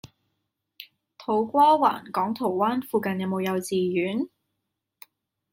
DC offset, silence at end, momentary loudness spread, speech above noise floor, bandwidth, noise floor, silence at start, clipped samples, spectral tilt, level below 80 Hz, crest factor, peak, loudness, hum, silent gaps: under 0.1%; 1.25 s; 21 LU; 58 dB; 16.5 kHz; -81 dBFS; 0.05 s; under 0.1%; -6 dB/octave; -72 dBFS; 18 dB; -8 dBFS; -24 LUFS; none; none